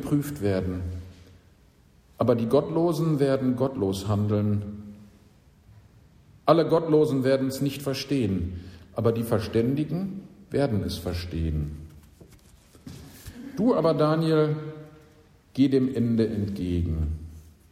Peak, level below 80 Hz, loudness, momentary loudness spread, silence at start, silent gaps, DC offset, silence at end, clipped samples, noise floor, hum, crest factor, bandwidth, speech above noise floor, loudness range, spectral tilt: -4 dBFS; -44 dBFS; -25 LUFS; 18 LU; 0 s; none; under 0.1%; 0.3 s; under 0.1%; -57 dBFS; none; 22 dB; 15.5 kHz; 33 dB; 5 LU; -7.5 dB/octave